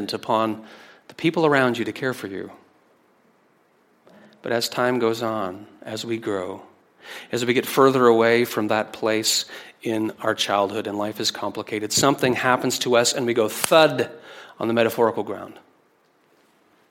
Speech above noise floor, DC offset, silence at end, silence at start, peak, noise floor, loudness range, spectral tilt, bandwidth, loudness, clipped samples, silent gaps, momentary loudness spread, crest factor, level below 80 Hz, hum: 40 dB; under 0.1%; 1.3 s; 0 s; 0 dBFS; -61 dBFS; 7 LU; -3.5 dB/octave; 16.5 kHz; -21 LUFS; under 0.1%; none; 17 LU; 22 dB; -68 dBFS; none